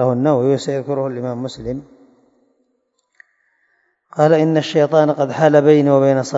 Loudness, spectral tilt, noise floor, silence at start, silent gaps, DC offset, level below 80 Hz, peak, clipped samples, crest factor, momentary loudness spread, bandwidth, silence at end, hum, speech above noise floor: -15 LUFS; -7 dB/octave; -67 dBFS; 0 s; none; under 0.1%; -54 dBFS; 0 dBFS; under 0.1%; 16 dB; 14 LU; 8 kHz; 0 s; none; 53 dB